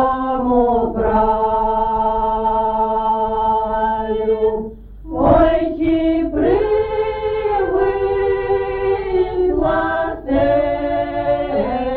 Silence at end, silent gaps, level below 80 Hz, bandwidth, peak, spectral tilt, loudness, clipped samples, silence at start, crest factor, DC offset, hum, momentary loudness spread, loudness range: 0 s; none; -32 dBFS; 4.6 kHz; -2 dBFS; -10.5 dB/octave; -17 LUFS; under 0.1%; 0 s; 16 dB; under 0.1%; none; 4 LU; 1 LU